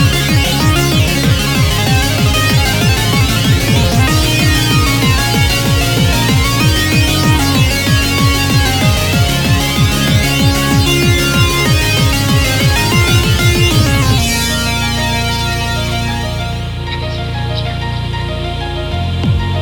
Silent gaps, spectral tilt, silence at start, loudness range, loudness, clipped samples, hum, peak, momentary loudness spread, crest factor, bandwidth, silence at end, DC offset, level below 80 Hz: none; -4.5 dB/octave; 0 s; 6 LU; -12 LUFS; under 0.1%; none; 0 dBFS; 8 LU; 12 dB; 19.5 kHz; 0 s; 0.2%; -22 dBFS